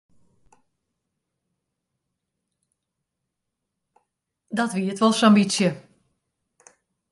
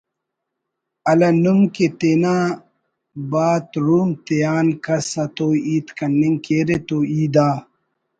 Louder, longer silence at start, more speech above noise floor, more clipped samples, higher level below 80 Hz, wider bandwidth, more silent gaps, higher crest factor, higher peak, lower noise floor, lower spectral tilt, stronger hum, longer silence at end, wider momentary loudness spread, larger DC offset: second, -21 LUFS vs -18 LUFS; first, 4.5 s vs 1.05 s; about the same, 62 dB vs 62 dB; neither; second, -72 dBFS vs -58 dBFS; first, 11.5 kHz vs 9.2 kHz; neither; first, 22 dB vs 16 dB; about the same, -4 dBFS vs -2 dBFS; about the same, -82 dBFS vs -79 dBFS; second, -5 dB/octave vs -7 dB/octave; neither; first, 1.35 s vs 0.55 s; first, 12 LU vs 8 LU; neither